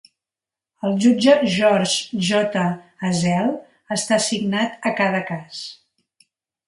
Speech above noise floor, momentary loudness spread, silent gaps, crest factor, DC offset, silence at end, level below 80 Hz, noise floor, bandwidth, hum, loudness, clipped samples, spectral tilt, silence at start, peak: 70 dB; 14 LU; none; 18 dB; under 0.1%; 0.95 s; -62 dBFS; -89 dBFS; 11.5 kHz; none; -20 LUFS; under 0.1%; -4.5 dB/octave; 0.85 s; -2 dBFS